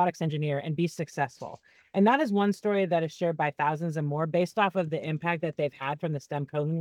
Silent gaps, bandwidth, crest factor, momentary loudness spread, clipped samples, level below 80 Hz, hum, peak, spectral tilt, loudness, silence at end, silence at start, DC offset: none; 13.5 kHz; 18 dB; 8 LU; under 0.1%; -76 dBFS; none; -10 dBFS; -7 dB/octave; -28 LUFS; 0 s; 0 s; under 0.1%